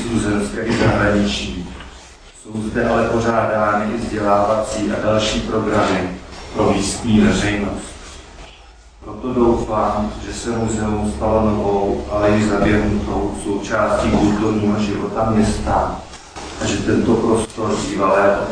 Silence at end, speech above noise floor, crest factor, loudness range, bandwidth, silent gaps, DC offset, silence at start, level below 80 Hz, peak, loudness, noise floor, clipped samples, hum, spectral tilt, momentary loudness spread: 0 s; 25 dB; 16 dB; 3 LU; 10.5 kHz; none; under 0.1%; 0 s; -32 dBFS; -2 dBFS; -18 LUFS; -43 dBFS; under 0.1%; none; -5.5 dB/octave; 13 LU